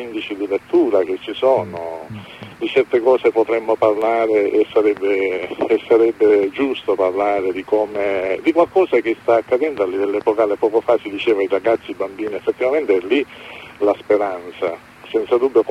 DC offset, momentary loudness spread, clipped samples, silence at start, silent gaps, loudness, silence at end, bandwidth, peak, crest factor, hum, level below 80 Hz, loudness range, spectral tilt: under 0.1%; 10 LU; under 0.1%; 0 s; none; -18 LUFS; 0 s; 10.5 kHz; -2 dBFS; 16 dB; none; -60 dBFS; 3 LU; -6 dB/octave